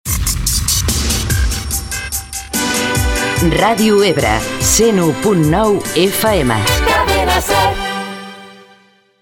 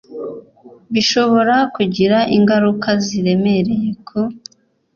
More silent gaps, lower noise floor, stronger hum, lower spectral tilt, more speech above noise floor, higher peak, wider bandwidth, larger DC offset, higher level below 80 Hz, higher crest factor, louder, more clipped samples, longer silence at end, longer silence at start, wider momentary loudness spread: neither; first, -49 dBFS vs -44 dBFS; neither; second, -3.5 dB/octave vs -5.5 dB/octave; first, 37 dB vs 29 dB; about the same, 0 dBFS vs -2 dBFS; first, 18 kHz vs 7.2 kHz; neither; first, -24 dBFS vs -54 dBFS; about the same, 14 dB vs 14 dB; about the same, -14 LUFS vs -15 LUFS; neither; about the same, 0.65 s vs 0.55 s; about the same, 0.05 s vs 0.1 s; second, 9 LU vs 16 LU